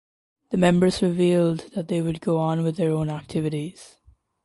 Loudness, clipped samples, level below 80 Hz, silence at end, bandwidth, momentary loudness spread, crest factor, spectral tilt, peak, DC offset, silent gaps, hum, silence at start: -23 LUFS; under 0.1%; -54 dBFS; 0.6 s; 11.5 kHz; 9 LU; 18 dB; -7 dB/octave; -6 dBFS; under 0.1%; none; none; 0.5 s